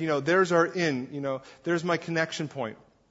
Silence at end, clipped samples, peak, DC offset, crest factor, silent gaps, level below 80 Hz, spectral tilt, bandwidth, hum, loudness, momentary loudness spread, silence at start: 0.35 s; under 0.1%; -8 dBFS; under 0.1%; 18 dB; none; -70 dBFS; -5.5 dB/octave; 8 kHz; none; -27 LUFS; 11 LU; 0 s